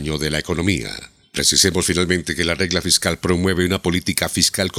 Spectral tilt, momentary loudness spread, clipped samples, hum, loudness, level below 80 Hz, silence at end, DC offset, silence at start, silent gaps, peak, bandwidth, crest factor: -3 dB/octave; 7 LU; under 0.1%; none; -18 LUFS; -42 dBFS; 0 s; under 0.1%; 0 s; none; 0 dBFS; 18.5 kHz; 20 dB